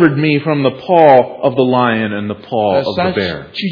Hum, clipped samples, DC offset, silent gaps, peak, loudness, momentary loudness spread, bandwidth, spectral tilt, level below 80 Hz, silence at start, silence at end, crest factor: none; 0.3%; under 0.1%; none; 0 dBFS; -13 LUFS; 11 LU; 5.4 kHz; -8.5 dB/octave; -52 dBFS; 0 s; 0 s; 12 dB